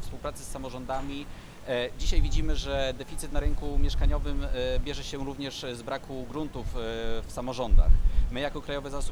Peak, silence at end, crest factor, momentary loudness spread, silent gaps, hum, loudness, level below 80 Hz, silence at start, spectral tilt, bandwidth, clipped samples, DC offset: -6 dBFS; 0 s; 20 dB; 9 LU; none; none; -32 LUFS; -28 dBFS; 0 s; -5 dB/octave; 12 kHz; under 0.1%; under 0.1%